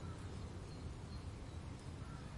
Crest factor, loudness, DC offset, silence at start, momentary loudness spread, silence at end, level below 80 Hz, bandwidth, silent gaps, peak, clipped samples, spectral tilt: 14 dB; -50 LUFS; under 0.1%; 0 s; 1 LU; 0 s; -56 dBFS; 11.5 kHz; none; -36 dBFS; under 0.1%; -6 dB/octave